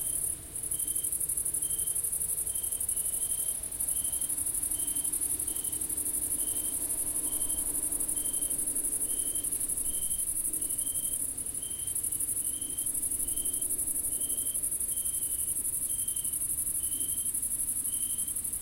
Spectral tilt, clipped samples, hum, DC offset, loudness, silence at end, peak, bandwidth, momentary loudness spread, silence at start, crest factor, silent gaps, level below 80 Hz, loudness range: -1 dB/octave; under 0.1%; none; under 0.1%; -29 LUFS; 0 s; -16 dBFS; 16.5 kHz; 2 LU; 0 s; 16 dB; none; -52 dBFS; 1 LU